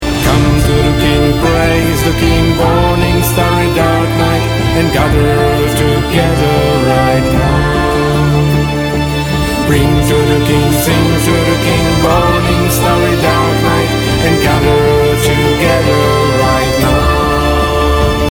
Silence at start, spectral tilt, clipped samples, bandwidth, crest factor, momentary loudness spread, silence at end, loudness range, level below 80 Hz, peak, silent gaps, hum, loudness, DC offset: 0 s; -5.5 dB/octave; under 0.1%; over 20 kHz; 10 dB; 2 LU; 0.05 s; 1 LU; -20 dBFS; 0 dBFS; none; none; -11 LUFS; 0.2%